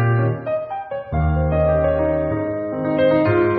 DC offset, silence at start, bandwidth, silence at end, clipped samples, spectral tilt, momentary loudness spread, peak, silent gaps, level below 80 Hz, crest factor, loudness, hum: under 0.1%; 0 s; 4.6 kHz; 0 s; under 0.1%; -7.5 dB/octave; 9 LU; -6 dBFS; none; -30 dBFS; 12 dB; -20 LUFS; none